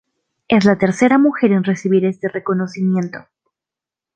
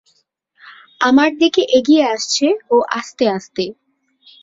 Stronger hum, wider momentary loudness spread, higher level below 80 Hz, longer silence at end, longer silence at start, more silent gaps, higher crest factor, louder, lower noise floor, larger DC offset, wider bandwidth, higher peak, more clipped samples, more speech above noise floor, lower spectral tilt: neither; about the same, 9 LU vs 10 LU; about the same, -58 dBFS vs -60 dBFS; first, 0.95 s vs 0.7 s; second, 0.5 s vs 0.65 s; neither; about the same, 16 dB vs 16 dB; about the same, -16 LUFS vs -15 LUFS; first, -87 dBFS vs -62 dBFS; neither; first, 9 kHz vs 7.8 kHz; about the same, 0 dBFS vs -2 dBFS; neither; first, 72 dB vs 47 dB; first, -7 dB/octave vs -3 dB/octave